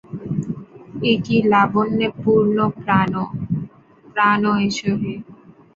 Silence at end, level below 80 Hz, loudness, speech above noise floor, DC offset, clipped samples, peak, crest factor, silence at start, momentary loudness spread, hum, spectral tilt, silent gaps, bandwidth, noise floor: 0.4 s; -52 dBFS; -19 LUFS; 30 dB; under 0.1%; under 0.1%; -2 dBFS; 18 dB; 0.1 s; 12 LU; none; -6.5 dB/octave; none; 7.6 kHz; -47 dBFS